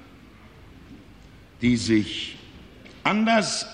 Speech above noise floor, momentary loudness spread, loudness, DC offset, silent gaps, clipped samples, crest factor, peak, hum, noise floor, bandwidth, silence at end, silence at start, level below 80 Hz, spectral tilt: 26 dB; 12 LU; -23 LUFS; under 0.1%; none; under 0.1%; 20 dB; -6 dBFS; none; -48 dBFS; 10.5 kHz; 0 s; 0.9 s; -52 dBFS; -4 dB/octave